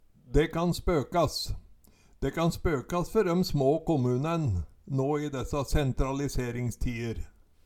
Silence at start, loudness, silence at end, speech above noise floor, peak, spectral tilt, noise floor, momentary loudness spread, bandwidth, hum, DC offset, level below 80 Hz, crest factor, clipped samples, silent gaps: 0.25 s; -29 LUFS; 0.35 s; 30 dB; -12 dBFS; -6.5 dB/octave; -58 dBFS; 9 LU; 16.5 kHz; none; under 0.1%; -38 dBFS; 18 dB; under 0.1%; none